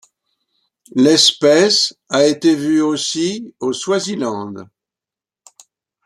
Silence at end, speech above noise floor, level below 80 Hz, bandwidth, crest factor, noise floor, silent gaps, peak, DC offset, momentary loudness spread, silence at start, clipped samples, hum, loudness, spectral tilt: 1.4 s; 74 dB; -64 dBFS; 13 kHz; 18 dB; -89 dBFS; none; 0 dBFS; under 0.1%; 13 LU; 0.95 s; under 0.1%; none; -15 LUFS; -3 dB/octave